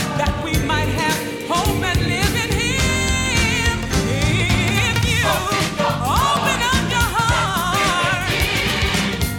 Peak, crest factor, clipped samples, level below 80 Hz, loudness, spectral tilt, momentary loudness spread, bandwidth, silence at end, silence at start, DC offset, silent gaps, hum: -4 dBFS; 14 dB; under 0.1%; -28 dBFS; -18 LUFS; -4 dB/octave; 3 LU; 19 kHz; 0 s; 0 s; under 0.1%; none; none